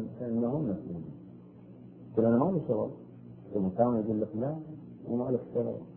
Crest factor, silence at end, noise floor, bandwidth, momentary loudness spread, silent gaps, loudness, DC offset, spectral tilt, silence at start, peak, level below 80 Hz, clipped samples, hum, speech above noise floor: 20 dB; 0 s; -50 dBFS; 3.2 kHz; 22 LU; none; -31 LUFS; under 0.1%; -13.5 dB/octave; 0 s; -12 dBFS; -62 dBFS; under 0.1%; none; 20 dB